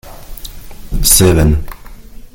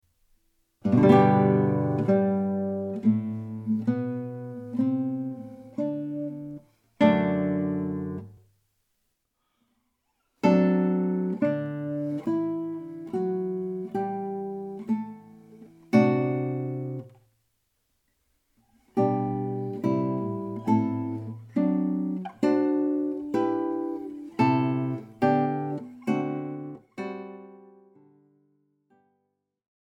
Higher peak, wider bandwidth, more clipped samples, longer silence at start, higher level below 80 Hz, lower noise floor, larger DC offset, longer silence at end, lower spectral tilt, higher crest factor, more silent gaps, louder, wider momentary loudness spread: first, 0 dBFS vs -6 dBFS; first, over 20 kHz vs 7.8 kHz; first, 0.1% vs under 0.1%; second, 0.05 s vs 0.85 s; first, -22 dBFS vs -70 dBFS; second, -31 dBFS vs -78 dBFS; neither; second, 0.15 s vs 2.35 s; second, -4 dB/octave vs -9.5 dB/octave; second, 14 dB vs 22 dB; neither; first, -10 LUFS vs -27 LUFS; first, 25 LU vs 15 LU